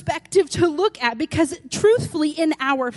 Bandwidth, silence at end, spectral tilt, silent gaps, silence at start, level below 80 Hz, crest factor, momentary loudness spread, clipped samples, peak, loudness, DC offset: 11.5 kHz; 0 s; -4.5 dB/octave; none; 0.05 s; -50 dBFS; 16 dB; 5 LU; under 0.1%; -4 dBFS; -20 LUFS; under 0.1%